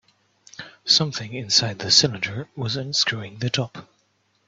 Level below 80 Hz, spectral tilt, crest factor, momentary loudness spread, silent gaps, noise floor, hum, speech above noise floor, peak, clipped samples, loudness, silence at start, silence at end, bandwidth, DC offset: -62 dBFS; -2.5 dB/octave; 24 dB; 16 LU; none; -67 dBFS; none; 43 dB; -2 dBFS; under 0.1%; -21 LUFS; 0.6 s; 0.65 s; 8.4 kHz; under 0.1%